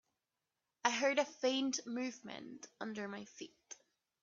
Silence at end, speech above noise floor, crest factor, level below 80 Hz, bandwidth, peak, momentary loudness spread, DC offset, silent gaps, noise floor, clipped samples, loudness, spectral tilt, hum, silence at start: 0.5 s; 50 dB; 26 dB; -88 dBFS; 7.6 kHz; -14 dBFS; 19 LU; under 0.1%; none; -90 dBFS; under 0.1%; -38 LUFS; -1.5 dB/octave; none; 0.85 s